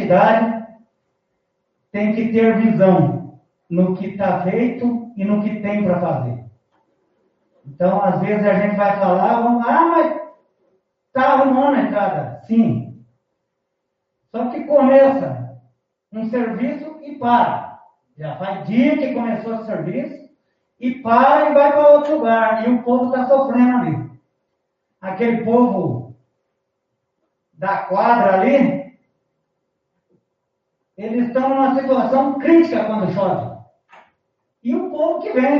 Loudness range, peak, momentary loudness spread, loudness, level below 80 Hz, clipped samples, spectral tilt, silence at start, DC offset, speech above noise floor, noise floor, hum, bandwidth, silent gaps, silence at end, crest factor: 7 LU; 0 dBFS; 15 LU; -17 LUFS; -64 dBFS; under 0.1%; -6.5 dB/octave; 0 s; under 0.1%; 59 dB; -75 dBFS; none; 6 kHz; none; 0 s; 18 dB